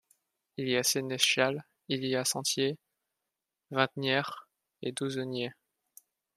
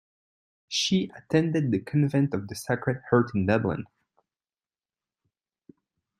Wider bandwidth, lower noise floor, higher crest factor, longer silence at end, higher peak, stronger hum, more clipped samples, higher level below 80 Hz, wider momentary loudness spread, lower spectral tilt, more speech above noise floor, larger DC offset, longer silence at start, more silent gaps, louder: about the same, 15.5 kHz vs 15 kHz; about the same, -88 dBFS vs under -90 dBFS; about the same, 26 dB vs 22 dB; second, 0.85 s vs 2.35 s; about the same, -8 dBFS vs -8 dBFS; neither; neither; second, -76 dBFS vs -62 dBFS; first, 14 LU vs 7 LU; second, -3 dB/octave vs -5.5 dB/octave; second, 57 dB vs over 65 dB; neither; about the same, 0.6 s vs 0.7 s; neither; second, -31 LUFS vs -26 LUFS